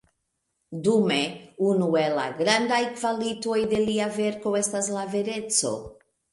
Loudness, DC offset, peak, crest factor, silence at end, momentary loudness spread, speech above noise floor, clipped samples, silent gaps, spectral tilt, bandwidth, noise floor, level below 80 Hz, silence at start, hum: -25 LUFS; under 0.1%; -8 dBFS; 18 dB; 0.4 s; 6 LU; 53 dB; under 0.1%; none; -3.5 dB/octave; 11.5 kHz; -77 dBFS; -62 dBFS; 0.7 s; none